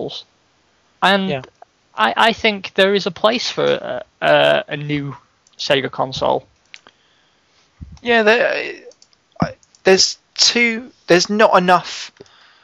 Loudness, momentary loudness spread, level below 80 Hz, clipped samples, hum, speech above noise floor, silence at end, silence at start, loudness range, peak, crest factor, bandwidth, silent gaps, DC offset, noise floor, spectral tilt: -16 LUFS; 15 LU; -54 dBFS; under 0.1%; none; 43 dB; 0.55 s; 0 s; 5 LU; 0 dBFS; 18 dB; 13.5 kHz; none; under 0.1%; -59 dBFS; -3 dB/octave